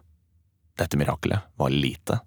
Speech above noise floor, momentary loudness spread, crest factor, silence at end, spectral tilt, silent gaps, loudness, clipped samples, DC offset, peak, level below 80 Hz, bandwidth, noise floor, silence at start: 39 dB; 6 LU; 18 dB; 0.05 s; -6 dB/octave; none; -26 LUFS; under 0.1%; under 0.1%; -8 dBFS; -46 dBFS; over 20 kHz; -65 dBFS; 0.75 s